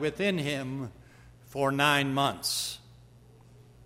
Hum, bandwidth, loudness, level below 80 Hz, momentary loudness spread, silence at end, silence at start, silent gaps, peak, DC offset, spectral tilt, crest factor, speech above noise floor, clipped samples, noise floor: none; 16 kHz; -28 LUFS; -60 dBFS; 16 LU; 0 s; 0 s; none; -10 dBFS; under 0.1%; -4 dB/octave; 22 dB; 26 dB; under 0.1%; -55 dBFS